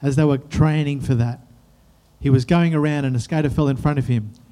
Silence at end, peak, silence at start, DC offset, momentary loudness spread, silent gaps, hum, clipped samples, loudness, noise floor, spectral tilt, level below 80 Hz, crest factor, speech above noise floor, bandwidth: 0.2 s; -4 dBFS; 0 s; under 0.1%; 7 LU; none; none; under 0.1%; -20 LUFS; -54 dBFS; -8 dB/octave; -40 dBFS; 16 dB; 35 dB; 11 kHz